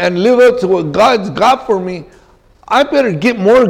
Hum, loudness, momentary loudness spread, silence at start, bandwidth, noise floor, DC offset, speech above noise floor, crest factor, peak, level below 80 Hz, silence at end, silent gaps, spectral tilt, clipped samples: none; -11 LUFS; 8 LU; 0 s; 13.5 kHz; -43 dBFS; under 0.1%; 32 dB; 10 dB; -2 dBFS; -46 dBFS; 0 s; none; -5.5 dB/octave; under 0.1%